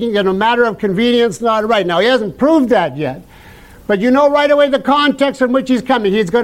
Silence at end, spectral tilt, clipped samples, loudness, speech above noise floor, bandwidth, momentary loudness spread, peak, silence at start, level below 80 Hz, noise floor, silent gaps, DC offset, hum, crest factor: 0 s; -5.5 dB/octave; under 0.1%; -13 LUFS; 26 dB; 15.5 kHz; 6 LU; -2 dBFS; 0 s; -46 dBFS; -39 dBFS; none; under 0.1%; none; 10 dB